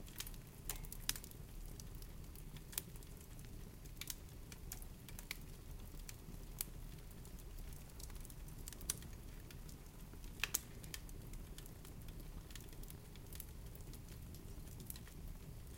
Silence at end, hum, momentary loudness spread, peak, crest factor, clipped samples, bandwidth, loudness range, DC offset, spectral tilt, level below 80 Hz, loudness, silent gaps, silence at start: 0 s; none; 11 LU; -12 dBFS; 38 dB; under 0.1%; 17 kHz; 6 LU; under 0.1%; -3 dB/octave; -54 dBFS; -50 LUFS; none; 0 s